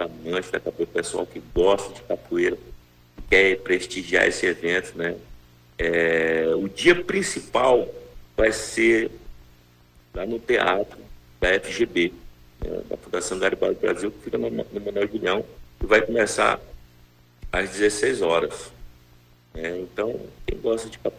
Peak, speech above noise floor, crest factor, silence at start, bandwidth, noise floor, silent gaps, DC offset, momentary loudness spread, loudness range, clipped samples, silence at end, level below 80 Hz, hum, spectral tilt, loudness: -6 dBFS; 31 dB; 18 dB; 0 s; 16 kHz; -54 dBFS; none; under 0.1%; 14 LU; 5 LU; under 0.1%; 0 s; -44 dBFS; 60 Hz at -50 dBFS; -4 dB/octave; -23 LUFS